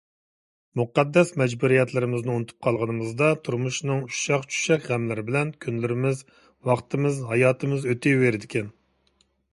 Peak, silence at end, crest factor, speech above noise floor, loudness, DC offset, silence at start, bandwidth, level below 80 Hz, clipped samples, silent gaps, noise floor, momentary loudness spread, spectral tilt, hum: -6 dBFS; 0.85 s; 18 dB; 43 dB; -24 LUFS; under 0.1%; 0.75 s; 11.5 kHz; -64 dBFS; under 0.1%; none; -67 dBFS; 8 LU; -6 dB/octave; none